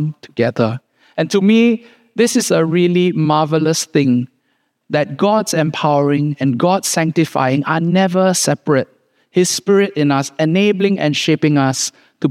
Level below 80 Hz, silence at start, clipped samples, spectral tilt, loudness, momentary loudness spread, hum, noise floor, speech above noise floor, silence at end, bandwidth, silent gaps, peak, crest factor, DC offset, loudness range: -68 dBFS; 0 s; under 0.1%; -5 dB/octave; -15 LUFS; 7 LU; none; -65 dBFS; 51 dB; 0 s; 16 kHz; none; 0 dBFS; 14 dB; under 0.1%; 2 LU